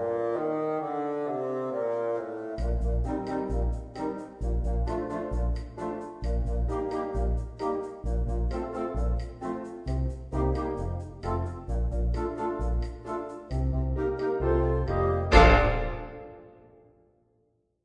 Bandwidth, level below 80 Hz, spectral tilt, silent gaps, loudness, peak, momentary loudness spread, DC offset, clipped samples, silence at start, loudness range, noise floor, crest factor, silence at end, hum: 9.4 kHz; -32 dBFS; -7.5 dB/octave; none; -29 LUFS; -2 dBFS; 9 LU; under 0.1%; under 0.1%; 0 s; 7 LU; -71 dBFS; 26 dB; 1.35 s; none